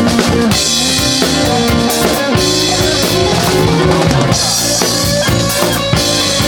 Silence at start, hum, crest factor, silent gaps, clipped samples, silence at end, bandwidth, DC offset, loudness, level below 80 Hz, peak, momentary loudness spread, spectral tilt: 0 s; none; 12 dB; none; under 0.1%; 0 s; over 20 kHz; under 0.1%; -11 LUFS; -28 dBFS; 0 dBFS; 2 LU; -3.5 dB/octave